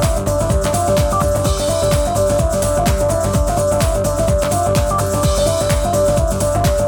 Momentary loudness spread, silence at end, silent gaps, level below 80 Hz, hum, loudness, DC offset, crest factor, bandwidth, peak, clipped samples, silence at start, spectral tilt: 2 LU; 0 s; none; -22 dBFS; none; -16 LUFS; under 0.1%; 12 dB; 19 kHz; -4 dBFS; under 0.1%; 0 s; -5 dB/octave